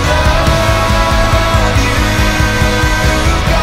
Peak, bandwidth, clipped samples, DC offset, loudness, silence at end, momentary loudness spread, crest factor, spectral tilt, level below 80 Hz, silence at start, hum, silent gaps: 0 dBFS; 16 kHz; under 0.1%; under 0.1%; -11 LUFS; 0 s; 1 LU; 10 dB; -4.5 dB/octave; -16 dBFS; 0 s; none; none